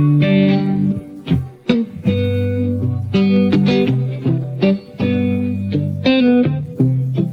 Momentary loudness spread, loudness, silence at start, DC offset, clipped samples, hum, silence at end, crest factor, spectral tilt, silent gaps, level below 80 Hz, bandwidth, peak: 7 LU; -17 LUFS; 0 s; under 0.1%; under 0.1%; none; 0 s; 14 dB; -9 dB/octave; none; -44 dBFS; 6.4 kHz; -2 dBFS